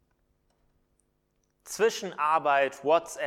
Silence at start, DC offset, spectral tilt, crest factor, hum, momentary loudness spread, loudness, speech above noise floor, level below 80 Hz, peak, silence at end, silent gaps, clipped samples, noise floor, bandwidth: 1.65 s; under 0.1%; -2.5 dB/octave; 20 dB; none; 5 LU; -26 LUFS; 48 dB; -72 dBFS; -10 dBFS; 0 s; none; under 0.1%; -74 dBFS; 16 kHz